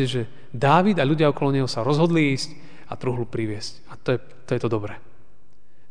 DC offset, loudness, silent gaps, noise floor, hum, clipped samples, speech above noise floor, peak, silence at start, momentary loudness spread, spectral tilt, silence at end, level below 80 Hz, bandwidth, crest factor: 2%; -23 LUFS; none; -61 dBFS; none; under 0.1%; 39 dB; -4 dBFS; 0 s; 15 LU; -6.5 dB/octave; 0.9 s; -58 dBFS; 10 kHz; 20 dB